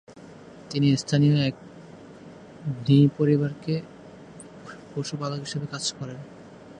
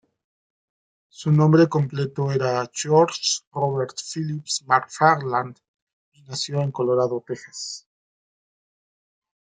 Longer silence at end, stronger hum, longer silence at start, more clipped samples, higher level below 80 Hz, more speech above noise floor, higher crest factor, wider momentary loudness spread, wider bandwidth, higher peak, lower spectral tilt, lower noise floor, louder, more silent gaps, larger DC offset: second, 0 s vs 1.65 s; neither; second, 0.1 s vs 1.2 s; neither; about the same, -64 dBFS vs -68 dBFS; second, 22 dB vs over 68 dB; about the same, 18 dB vs 22 dB; first, 25 LU vs 14 LU; about the same, 10 kHz vs 9.4 kHz; second, -8 dBFS vs -2 dBFS; first, -6.5 dB/octave vs -5 dB/octave; second, -46 dBFS vs under -90 dBFS; second, -25 LUFS vs -22 LUFS; second, none vs 3.47-3.51 s, 5.68-5.74 s, 5.82-5.87 s, 5.93-6.12 s; neither